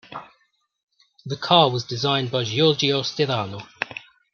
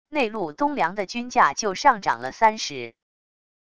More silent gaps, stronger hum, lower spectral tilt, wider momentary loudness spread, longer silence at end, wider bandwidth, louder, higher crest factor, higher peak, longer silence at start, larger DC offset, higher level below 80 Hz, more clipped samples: first, 0.83-0.87 s vs none; neither; first, -5 dB/octave vs -3 dB/octave; first, 20 LU vs 10 LU; second, 0.35 s vs 0.65 s; second, 7.2 kHz vs 10 kHz; about the same, -21 LUFS vs -23 LUFS; about the same, 22 dB vs 20 dB; about the same, -2 dBFS vs -4 dBFS; about the same, 0.1 s vs 0.05 s; second, under 0.1% vs 0.5%; second, -66 dBFS vs -58 dBFS; neither